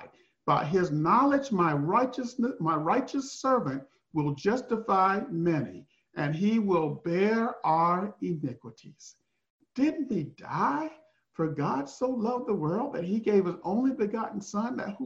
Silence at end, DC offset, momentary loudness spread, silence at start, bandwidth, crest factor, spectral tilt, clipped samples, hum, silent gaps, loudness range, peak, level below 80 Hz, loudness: 0 s; under 0.1%; 10 LU; 0 s; 8 kHz; 18 dB; -7 dB/octave; under 0.1%; none; 9.50-9.59 s; 5 LU; -10 dBFS; -68 dBFS; -28 LUFS